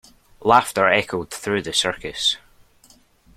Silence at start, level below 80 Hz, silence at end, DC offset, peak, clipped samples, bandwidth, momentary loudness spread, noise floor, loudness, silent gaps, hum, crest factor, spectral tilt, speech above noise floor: 0.4 s; -54 dBFS; 1 s; under 0.1%; -2 dBFS; under 0.1%; 16 kHz; 10 LU; -54 dBFS; -20 LUFS; none; none; 22 dB; -2.5 dB/octave; 34 dB